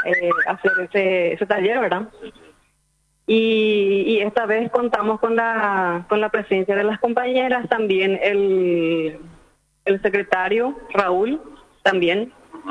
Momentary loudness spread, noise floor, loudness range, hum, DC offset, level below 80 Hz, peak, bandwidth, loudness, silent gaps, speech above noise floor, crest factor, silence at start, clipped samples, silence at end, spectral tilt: 5 LU; -65 dBFS; 2 LU; none; under 0.1%; -58 dBFS; 0 dBFS; 10 kHz; -20 LUFS; none; 46 dB; 20 dB; 0 s; under 0.1%; 0 s; -6.5 dB/octave